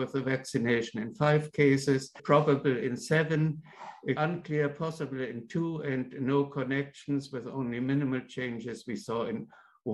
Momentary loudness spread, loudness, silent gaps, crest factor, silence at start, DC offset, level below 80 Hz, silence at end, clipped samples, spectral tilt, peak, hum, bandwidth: 12 LU; -30 LUFS; none; 20 dB; 0 s; under 0.1%; -68 dBFS; 0 s; under 0.1%; -6.5 dB/octave; -10 dBFS; none; 12 kHz